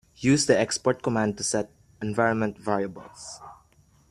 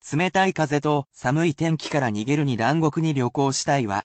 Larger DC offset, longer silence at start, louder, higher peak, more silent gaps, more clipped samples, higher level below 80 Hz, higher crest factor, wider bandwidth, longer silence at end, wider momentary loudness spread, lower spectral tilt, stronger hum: neither; first, 0.2 s vs 0.05 s; about the same, -25 LUFS vs -23 LUFS; about the same, -6 dBFS vs -8 dBFS; neither; neither; about the same, -60 dBFS vs -58 dBFS; first, 22 dB vs 14 dB; first, 14 kHz vs 9 kHz; first, 0.55 s vs 0 s; first, 19 LU vs 3 LU; about the same, -4.5 dB/octave vs -5.5 dB/octave; neither